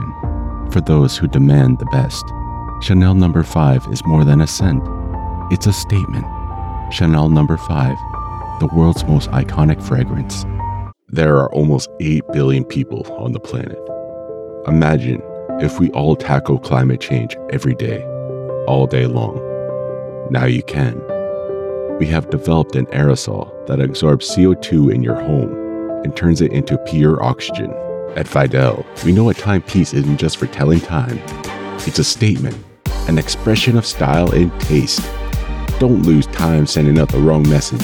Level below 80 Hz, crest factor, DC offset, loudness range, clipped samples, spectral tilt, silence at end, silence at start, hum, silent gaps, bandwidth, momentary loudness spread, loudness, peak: -30 dBFS; 14 dB; under 0.1%; 4 LU; under 0.1%; -6.5 dB/octave; 0 s; 0 s; none; none; 18.5 kHz; 11 LU; -16 LUFS; -2 dBFS